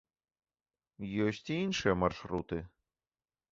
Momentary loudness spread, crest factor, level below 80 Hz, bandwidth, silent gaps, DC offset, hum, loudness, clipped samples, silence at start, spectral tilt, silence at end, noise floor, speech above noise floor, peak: 11 LU; 22 dB; -56 dBFS; 7.8 kHz; none; under 0.1%; none; -34 LUFS; under 0.1%; 1 s; -5.5 dB/octave; 0.85 s; under -90 dBFS; over 56 dB; -14 dBFS